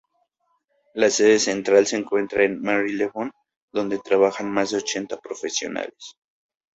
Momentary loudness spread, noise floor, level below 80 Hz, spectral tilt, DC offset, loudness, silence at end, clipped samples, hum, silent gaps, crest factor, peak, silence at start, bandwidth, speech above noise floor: 14 LU; -71 dBFS; -64 dBFS; -3 dB/octave; under 0.1%; -22 LUFS; 0.65 s; under 0.1%; none; 3.56-3.68 s; 20 dB; -4 dBFS; 0.95 s; 8 kHz; 49 dB